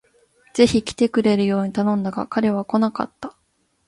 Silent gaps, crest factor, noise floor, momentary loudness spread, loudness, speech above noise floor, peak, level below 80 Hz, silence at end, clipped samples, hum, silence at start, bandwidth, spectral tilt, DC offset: none; 20 dB; -67 dBFS; 12 LU; -20 LUFS; 47 dB; -2 dBFS; -52 dBFS; 0.55 s; under 0.1%; none; 0.55 s; 11.5 kHz; -6 dB/octave; under 0.1%